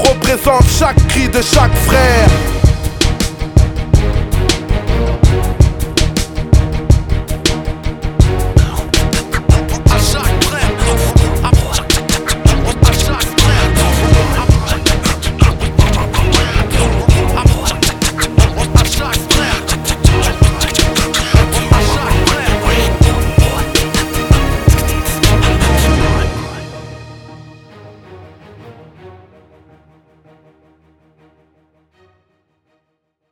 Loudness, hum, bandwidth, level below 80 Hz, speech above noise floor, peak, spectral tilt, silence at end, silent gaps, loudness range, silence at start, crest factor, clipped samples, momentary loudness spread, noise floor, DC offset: -12 LUFS; none; 19 kHz; -16 dBFS; 59 dB; 0 dBFS; -4.5 dB/octave; 4.2 s; none; 3 LU; 0 s; 12 dB; 0.7%; 5 LU; -68 dBFS; under 0.1%